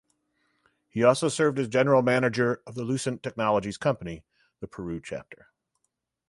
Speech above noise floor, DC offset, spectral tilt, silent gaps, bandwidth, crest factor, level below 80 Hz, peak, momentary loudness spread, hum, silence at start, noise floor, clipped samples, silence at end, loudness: 54 dB; under 0.1%; -5.5 dB/octave; none; 11.5 kHz; 20 dB; -60 dBFS; -6 dBFS; 17 LU; none; 0.95 s; -79 dBFS; under 0.1%; 0.95 s; -26 LUFS